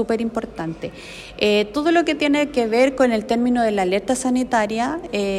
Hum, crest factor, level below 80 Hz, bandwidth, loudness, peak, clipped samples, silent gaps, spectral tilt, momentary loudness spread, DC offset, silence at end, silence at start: none; 18 dB; -48 dBFS; 13 kHz; -20 LUFS; -2 dBFS; under 0.1%; none; -4.5 dB/octave; 11 LU; under 0.1%; 0 s; 0 s